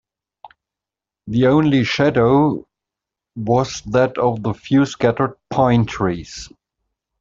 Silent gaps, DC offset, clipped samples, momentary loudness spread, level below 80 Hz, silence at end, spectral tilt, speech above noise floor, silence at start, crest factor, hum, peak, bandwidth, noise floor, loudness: none; under 0.1%; under 0.1%; 14 LU; -46 dBFS; 0.75 s; -6.5 dB/octave; 70 dB; 0.45 s; 16 dB; none; -2 dBFS; 7.6 kHz; -87 dBFS; -17 LUFS